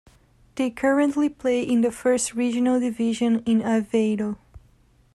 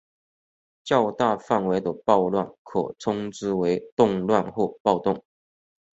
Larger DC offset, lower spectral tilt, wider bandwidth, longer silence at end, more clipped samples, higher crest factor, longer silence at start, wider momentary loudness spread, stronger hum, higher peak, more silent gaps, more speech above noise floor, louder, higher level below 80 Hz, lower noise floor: neither; second, -5 dB/octave vs -6.5 dB/octave; first, 12.5 kHz vs 8 kHz; second, 0.55 s vs 0.75 s; neither; second, 14 dB vs 22 dB; second, 0.55 s vs 0.85 s; about the same, 7 LU vs 7 LU; neither; second, -10 dBFS vs -4 dBFS; second, none vs 2.58-2.65 s, 3.92-3.97 s, 4.80-4.85 s; second, 36 dB vs over 67 dB; about the same, -23 LUFS vs -24 LUFS; about the same, -56 dBFS vs -60 dBFS; second, -58 dBFS vs under -90 dBFS